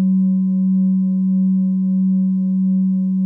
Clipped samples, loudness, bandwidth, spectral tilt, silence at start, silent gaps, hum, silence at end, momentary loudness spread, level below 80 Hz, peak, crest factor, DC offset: under 0.1%; -17 LUFS; 1.1 kHz; -14.5 dB/octave; 0 s; none; none; 0 s; 1 LU; -78 dBFS; -12 dBFS; 4 dB; under 0.1%